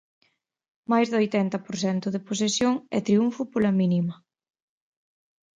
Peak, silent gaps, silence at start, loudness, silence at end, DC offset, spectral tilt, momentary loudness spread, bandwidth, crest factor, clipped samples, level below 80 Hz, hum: -8 dBFS; none; 0.9 s; -25 LUFS; 1.45 s; under 0.1%; -5.5 dB/octave; 6 LU; 9.4 kHz; 18 dB; under 0.1%; -66 dBFS; none